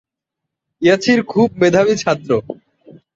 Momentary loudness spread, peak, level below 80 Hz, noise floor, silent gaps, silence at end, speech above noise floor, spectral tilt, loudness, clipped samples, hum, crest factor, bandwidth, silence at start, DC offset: 7 LU; -2 dBFS; -54 dBFS; -81 dBFS; none; 0.6 s; 67 dB; -5.5 dB/octave; -15 LUFS; under 0.1%; none; 16 dB; 7.8 kHz; 0.8 s; under 0.1%